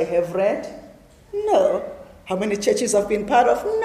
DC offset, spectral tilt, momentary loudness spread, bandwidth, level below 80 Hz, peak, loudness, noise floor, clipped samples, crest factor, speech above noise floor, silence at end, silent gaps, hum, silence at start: under 0.1%; -4 dB/octave; 14 LU; 15 kHz; -52 dBFS; -4 dBFS; -21 LUFS; -46 dBFS; under 0.1%; 16 dB; 27 dB; 0 s; none; none; 0 s